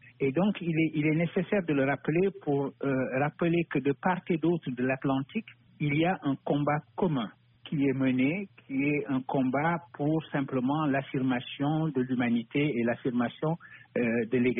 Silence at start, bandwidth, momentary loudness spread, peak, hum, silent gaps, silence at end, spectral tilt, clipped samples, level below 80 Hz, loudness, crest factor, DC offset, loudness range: 0.05 s; 3.8 kHz; 4 LU; -16 dBFS; none; none; 0 s; -6 dB/octave; under 0.1%; -66 dBFS; -29 LUFS; 14 dB; under 0.1%; 1 LU